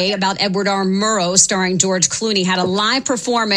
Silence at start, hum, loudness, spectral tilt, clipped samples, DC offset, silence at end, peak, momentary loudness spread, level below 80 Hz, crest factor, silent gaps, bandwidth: 0 s; none; -15 LUFS; -2.5 dB/octave; under 0.1%; under 0.1%; 0 s; 0 dBFS; 5 LU; -56 dBFS; 16 dB; none; 13 kHz